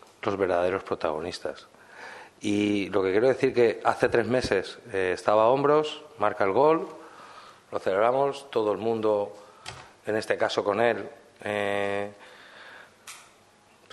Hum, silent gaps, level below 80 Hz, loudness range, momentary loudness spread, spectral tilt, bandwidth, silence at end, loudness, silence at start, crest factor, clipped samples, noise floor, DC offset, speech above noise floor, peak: none; none; -62 dBFS; 5 LU; 22 LU; -5.5 dB/octave; 12.5 kHz; 0.7 s; -26 LUFS; 0.25 s; 22 dB; under 0.1%; -58 dBFS; under 0.1%; 33 dB; -6 dBFS